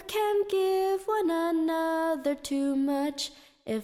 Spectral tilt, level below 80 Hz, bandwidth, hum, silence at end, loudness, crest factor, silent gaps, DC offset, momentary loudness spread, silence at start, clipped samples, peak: -3.5 dB/octave; -64 dBFS; 16.5 kHz; none; 0 s; -28 LUFS; 12 dB; none; under 0.1%; 7 LU; 0 s; under 0.1%; -16 dBFS